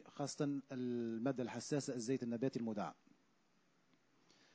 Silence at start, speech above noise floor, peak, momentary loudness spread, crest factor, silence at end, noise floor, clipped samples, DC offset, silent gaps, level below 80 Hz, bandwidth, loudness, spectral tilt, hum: 0 s; 36 dB; -26 dBFS; 4 LU; 18 dB; 1.6 s; -77 dBFS; under 0.1%; under 0.1%; none; -86 dBFS; 8 kHz; -42 LUFS; -5.5 dB/octave; none